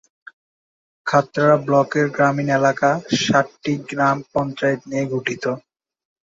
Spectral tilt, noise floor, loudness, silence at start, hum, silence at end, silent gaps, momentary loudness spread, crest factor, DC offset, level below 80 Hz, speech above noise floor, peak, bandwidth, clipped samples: -5.5 dB/octave; under -90 dBFS; -19 LUFS; 1.05 s; none; 0.7 s; none; 8 LU; 18 dB; under 0.1%; -60 dBFS; over 71 dB; -2 dBFS; 7.8 kHz; under 0.1%